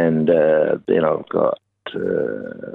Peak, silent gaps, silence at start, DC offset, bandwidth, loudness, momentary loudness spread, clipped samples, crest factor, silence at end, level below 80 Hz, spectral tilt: -4 dBFS; none; 0 s; under 0.1%; 4 kHz; -19 LUFS; 14 LU; under 0.1%; 16 dB; 0 s; -58 dBFS; -10 dB/octave